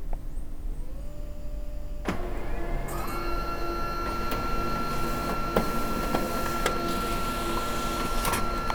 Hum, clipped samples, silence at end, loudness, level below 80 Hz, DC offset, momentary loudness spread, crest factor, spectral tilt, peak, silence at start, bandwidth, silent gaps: none; under 0.1%; 0 s; -31 LUFS; -32 dBFS; under 0.1%; 13 LU; 20 dB; -4.5 dB/octave; -8 dBFS; 0 s; over 20 kHz; none